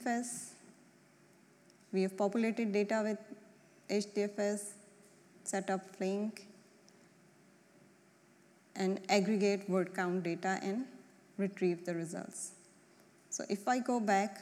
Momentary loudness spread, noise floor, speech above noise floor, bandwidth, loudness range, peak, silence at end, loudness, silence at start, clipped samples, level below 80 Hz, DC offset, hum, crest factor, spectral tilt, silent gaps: 14 LU; -65 dBFS; 30 dB; 14.5 kHz; 7 LU; -14 dBFS; 0 s; -36 LUFS; 0 s; under 0.1%; under -90 dBFS; under 0.1%; none; 22 dB; -5 dB/octave; none